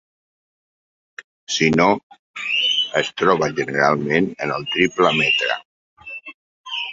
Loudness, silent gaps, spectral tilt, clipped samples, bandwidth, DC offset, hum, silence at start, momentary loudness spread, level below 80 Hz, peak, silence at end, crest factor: -18 LUFS; 1.24-1.47 s, 2.03-2.10 s, 2.19-2.34 s, 5.65-5.97 s, 6.34-6.64 s; -4 dB/octave; under 0.1%; 7.8 kHz; under 0.1%; none; 1.2 s; 18 LU; -58 dBFS; -2 dBFS; 0 s; 20 dB